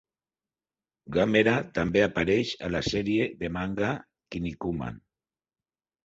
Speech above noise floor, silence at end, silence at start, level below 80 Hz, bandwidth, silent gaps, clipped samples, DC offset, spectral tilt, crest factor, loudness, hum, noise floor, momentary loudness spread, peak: over 63 dB; 1.05 s; 1.05 s; -50 dBFS; 8 kHz; none; under 0.1%; under 0.1%; -6 dB/octave; 20 dB; -27 LUFS; none; under -90 dBFS; 12 LU; -8 dBFS